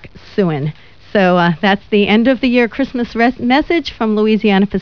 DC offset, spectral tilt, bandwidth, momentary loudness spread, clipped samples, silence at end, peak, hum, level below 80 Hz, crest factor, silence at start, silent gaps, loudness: 0.8%; -7.5 dB/octave; 5.4 kHz; 7 LU; under 0.1%; 0 s; 0 dBFS; none; -42 dBFS; 14 dB; 0 s; none; -14 LUFS